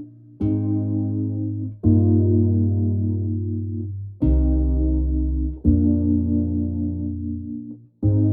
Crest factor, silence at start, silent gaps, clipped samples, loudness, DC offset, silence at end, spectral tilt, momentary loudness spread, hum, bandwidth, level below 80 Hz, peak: 16 dB; 0 s; none; under 0.1%; -22 LUFS; under 0.1%; 0 s; -15 dB/octave; 11 LU; none; 1.3 kHz; -28 dBFS; -4 dBFS